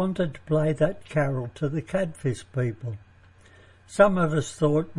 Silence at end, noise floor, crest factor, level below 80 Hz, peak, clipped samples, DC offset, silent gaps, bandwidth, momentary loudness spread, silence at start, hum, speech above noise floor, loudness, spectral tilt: 0 s; -54 dBFS; 22 dB; -52 dBFS; -4 dBFS; under 0.1%; under 0.1%; none; 11.5 kHz; 11 LU; 0 s; none; 29 dB; -26 LUFS; -7 dB/octave